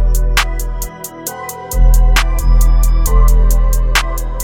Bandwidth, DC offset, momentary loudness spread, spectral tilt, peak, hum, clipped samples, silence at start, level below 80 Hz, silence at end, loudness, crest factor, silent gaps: 17 kHz; under 0.1%; 11 LU; -3.5 dB/octave; 0 dBFS; none; under 0.1%; 0 s; -10 dBFS; 0 s; -15 LUFS; 10 dB; none